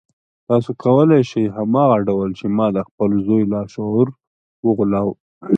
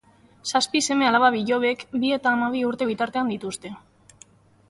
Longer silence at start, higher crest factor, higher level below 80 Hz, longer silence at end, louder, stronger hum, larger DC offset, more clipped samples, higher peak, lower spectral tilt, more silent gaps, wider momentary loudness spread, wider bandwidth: about the same, 0.5 s vs 0.45 s; about the same, 16 dB vs 18 dB; first, -52 dBFS vs -64 dBFS; second, 0 s vs 0.9 s; first, -18 LUFS vs -22 LUFS; neither; neither; neither; first, -2 dBFS vs -6 dBFS; first, -9 dB/octave vs -3 dB/octave; first, 2.91-2.98 s, 4.27-4.63 s, 5.20-5.41 s vs none; second, 7 LU vs 13 LU; second, 7.4 kHz vs 11.5 kHz